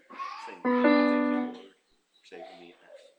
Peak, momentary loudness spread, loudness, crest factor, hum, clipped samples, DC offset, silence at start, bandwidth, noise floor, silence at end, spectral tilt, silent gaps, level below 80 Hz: -10 dBFS; 25 LU; -26 LUFS; 20 dB; none; under 0.1%; under 0.1%; 0.1 s; 8.2 kHz; -68 dBFS; 0.2 s; -5.5 dB/octave; none; -82 dBFS